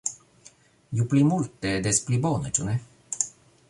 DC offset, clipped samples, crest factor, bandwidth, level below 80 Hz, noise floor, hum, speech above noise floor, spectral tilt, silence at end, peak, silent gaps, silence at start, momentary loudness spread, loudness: under 0.1%; under 0.1%; 22 dB; 11.5 kHz; -54 dBFS; -55 dBFS; none; 31 dB; -5 dB/octave; 0.4 s; -4 dBFS; none; 0.05 s; 11 LU; -25 LUFS